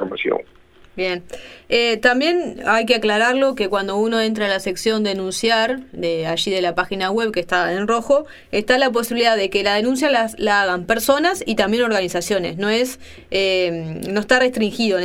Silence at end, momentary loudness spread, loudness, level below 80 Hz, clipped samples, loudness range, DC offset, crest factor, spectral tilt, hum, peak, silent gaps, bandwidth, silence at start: 0 s; 8 LU; -19 LUFS; -50 dBFS; under 0.1%; 2 LU; under 0.1%; 18 dB; -3.5 dB/octave; none; -2 dBFS; none; 17 kHz; 0 s